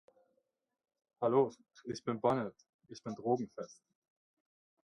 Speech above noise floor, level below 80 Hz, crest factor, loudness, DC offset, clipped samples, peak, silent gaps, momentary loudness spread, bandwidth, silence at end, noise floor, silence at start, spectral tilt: 47 dB; -78 dBFS; 22 dB; -36 LUFS; under 0.1%; under 0.1%; -16 dBFS; 2.69-2.79 s; 18 LU; 10.5 kHz; 1.15 s; -83 dBFS; 1.2 s; -7 dB/octave